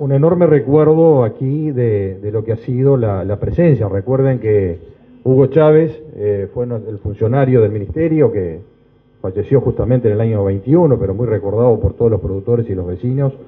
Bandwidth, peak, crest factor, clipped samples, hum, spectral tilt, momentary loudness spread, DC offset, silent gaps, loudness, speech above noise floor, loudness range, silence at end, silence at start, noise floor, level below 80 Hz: 3.9 kHz; 0 dBFS; 14 dB; under 0.1%; none; -13 dB/octave; 11 LU; under 0.1%; none; -15 LUFS; 36 dB; 2 LU; 0.05 s; 0 s; -50 dBFS; -40 dBFS